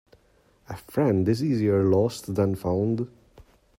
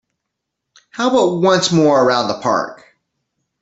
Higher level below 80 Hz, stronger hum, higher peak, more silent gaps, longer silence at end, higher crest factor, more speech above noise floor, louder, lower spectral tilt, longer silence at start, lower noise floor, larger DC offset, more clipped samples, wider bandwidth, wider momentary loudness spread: about the same, -58 dBFS vs -58 dBFS; neither; second, -10 dBFS vs -2 dBFS; neither; second, 0.4 s vs 0.85 s; about the same, 16 dB vs 14 dB; second, 38 dB vs 63 dB; second, -24 LUFS vs -15 LUFS; first, -8 dB/octave vs -4.5 dB/octave; second, 0.7 s vs 0.95 s; second, -62 dBFS vs -78 dBFS; neither; neither; first, 16 kHz vs 8.4 kHz; first, 12 LU vs 8 LU